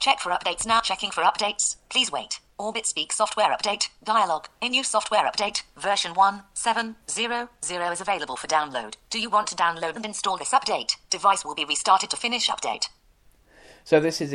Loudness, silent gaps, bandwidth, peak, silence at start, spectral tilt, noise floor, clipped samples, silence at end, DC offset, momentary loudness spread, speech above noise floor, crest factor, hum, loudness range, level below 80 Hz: -24 LUFS; none; 14 kHz; -4 dBFS; 0 s; -1 dB/octave; -58 dBFS; under 0.1%; 0 s; under 0.1%; 7 LU; 33 dB; 22 dB; none; 3 LU; -60 dBFS